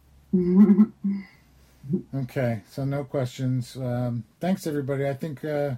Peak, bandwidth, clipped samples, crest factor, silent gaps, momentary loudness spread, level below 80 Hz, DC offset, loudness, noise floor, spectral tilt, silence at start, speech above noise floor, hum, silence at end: -6 dBFS; 14 kHz; under 0.1%; 18 dB; none; 13 LU; -58 dBFS; under 0.1%; -25 LUFS; -56 dBFS; -8.5 dB/octave; 0.35 s; 32 dB; none; 0 s